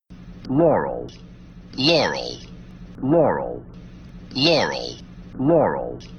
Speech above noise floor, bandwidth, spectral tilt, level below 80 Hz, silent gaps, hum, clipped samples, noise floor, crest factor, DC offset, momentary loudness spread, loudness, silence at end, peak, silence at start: 20 dB; 8.8 kHz; -5.5 dB/octave; -46 dBFS; none; none; under 0.1%; -40 dBFS; 18 dB; under 0.1%; 24 LU; -20 LUFS; 0 s; -4 dBFS; 0.1 s